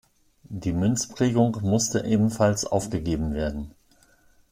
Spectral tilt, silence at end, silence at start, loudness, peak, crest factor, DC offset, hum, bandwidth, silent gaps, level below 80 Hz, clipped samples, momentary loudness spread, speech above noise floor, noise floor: -5.5 dB/octave; 0.8 s; 0.5 s; -24 LUFS; -8 dBFS; 18 dB; under 0.1%; none; 16 kHz; none; -44 dBFS; under 0.1%; 10 LU; 35 dB; -59 dBFS